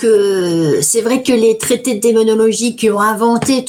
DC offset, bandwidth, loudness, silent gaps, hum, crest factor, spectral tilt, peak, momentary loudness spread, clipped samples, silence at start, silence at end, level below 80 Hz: under 0.1%; 17.5 kHz; -13 LUFS; none; none; 10 dB; -4 dB/octave; -2 dBFS; 3 LU; under 0.1%; 0 s; 0 s; -54 dBFS